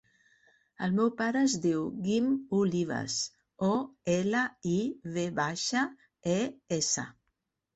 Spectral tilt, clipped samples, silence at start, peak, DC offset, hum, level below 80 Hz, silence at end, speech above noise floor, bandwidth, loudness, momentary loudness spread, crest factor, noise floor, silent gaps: -4.5 dB/octave; under 0.1%; 0.8 s; -16 dBFS; under 0.1%; none; -68 dBFS; 0.65 s; 52 dB; 8.4 kHz; -30 LUFS; 6 LU; 14 dB; -81 dBFS; none